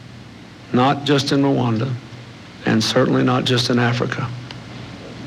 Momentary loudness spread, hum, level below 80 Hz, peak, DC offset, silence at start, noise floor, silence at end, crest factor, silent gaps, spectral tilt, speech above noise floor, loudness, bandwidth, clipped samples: 21 LU; none; -52 dBFS; -4 dBFS; under 0.1%; 0 s; -39 dBFS; 0 s; 16 dB; none; -5.5 dB/octave; 22 dB; -18 LUFS; 14.5 kHz; under 0.1%